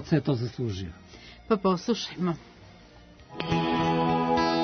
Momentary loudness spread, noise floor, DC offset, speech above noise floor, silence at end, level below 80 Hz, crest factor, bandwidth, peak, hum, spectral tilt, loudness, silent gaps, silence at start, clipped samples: 19 LU; -51 dBFS; under 0.1%; 23 dB; 0 s; -54 dBFS; 16 dB; 6.6 kHz; -12 dBFS; none; -6.5 dB/octave; -27 LUFS; none; 0 s; under 0.1%